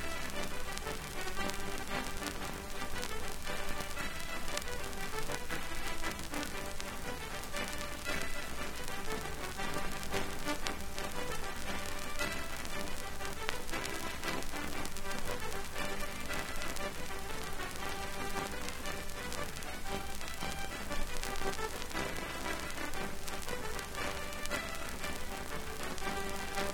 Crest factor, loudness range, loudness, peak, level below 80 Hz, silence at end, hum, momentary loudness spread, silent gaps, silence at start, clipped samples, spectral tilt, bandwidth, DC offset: 26 dB; 1 LU; -40 LUFS; -10 dBFS; -44 dBFS; 0 s; none; 3 LU; none; 0 s; under 0.1%; -3 dB/octave; 18.5 kHz; under 0.1%